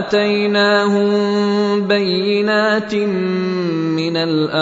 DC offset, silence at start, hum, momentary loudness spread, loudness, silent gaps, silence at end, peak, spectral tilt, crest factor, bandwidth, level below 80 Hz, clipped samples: under 0.1%; 0 s; none; 5 LU; -16 LUFS; none; 0 s; -2 dBFS; -6 dB/octave; 14 dB; 8 kHz; -60 dBFS; under 0.1%